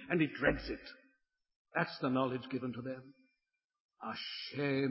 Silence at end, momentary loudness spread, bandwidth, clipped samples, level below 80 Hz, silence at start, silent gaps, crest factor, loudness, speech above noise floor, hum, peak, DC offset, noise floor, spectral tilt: 0 s; 13 LU; 5.8 kHz; under 0.1%; -60 dBFS; 0 s; 1.56-1.65 s, 3.65-3.69 s, 3.80-3.89 s; 22 dB; -37 LUFS; 50 dB; none; -16 dBFS; under 0.1%; -86 dBFS; -9 dB/octave